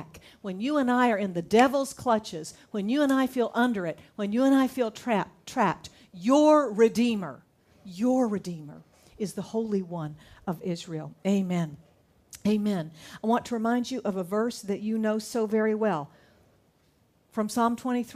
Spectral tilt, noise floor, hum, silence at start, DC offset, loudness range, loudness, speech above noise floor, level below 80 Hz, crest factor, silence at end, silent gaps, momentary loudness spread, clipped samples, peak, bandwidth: -6 dB/octave; -66 dBFS; none; 0 s; under 0.1%; 6 LU; -27 LUFS; 39 dB; -66 dBFS; 20 dB; 0 s; none; 15 LU; under 0.1%; -8 dBFS; 15.5 kHz